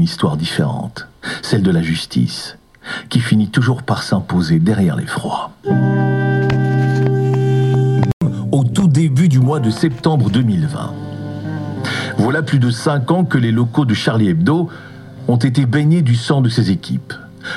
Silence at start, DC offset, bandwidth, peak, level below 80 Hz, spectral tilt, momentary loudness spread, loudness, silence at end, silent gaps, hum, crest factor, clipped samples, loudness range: 0 s; under 0.1%; 12 kHz; 0 dBFS; -46 dBFS; -7 dB/octave; 11 LU; -16 LUFS; 0 s; 8.13-8.20 s; none; 16 dB; under 0.1%; 3 LU